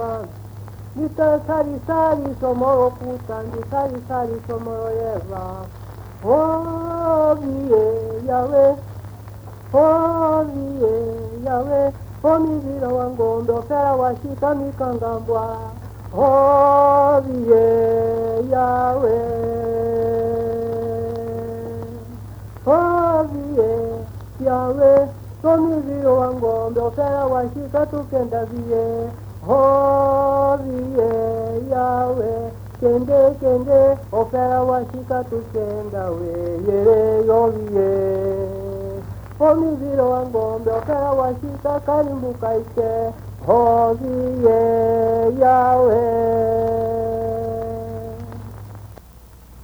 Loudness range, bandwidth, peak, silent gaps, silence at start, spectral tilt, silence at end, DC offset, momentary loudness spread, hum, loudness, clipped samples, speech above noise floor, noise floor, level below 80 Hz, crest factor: 5 LU; over 20 kHz; -2 dBFS; none; 0 s; -9 dB/octave; 0 s; under 0.1%; 15 LU; none; -19 LUFS; under 0.1%; 25 dB; -43 dBFS; -42 dBFS; 16 dB